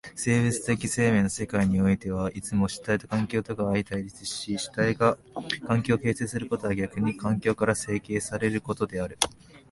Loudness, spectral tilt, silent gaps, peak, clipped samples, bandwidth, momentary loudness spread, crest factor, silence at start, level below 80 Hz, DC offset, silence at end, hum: -27 LUFS; -5 dB/octave; none; -2 dBFS; under 0.1%; 11.5 kHz; 7 LU; 24 dB; 0.05 s; -50 dBFS; under 0.1%; 0.15 s; none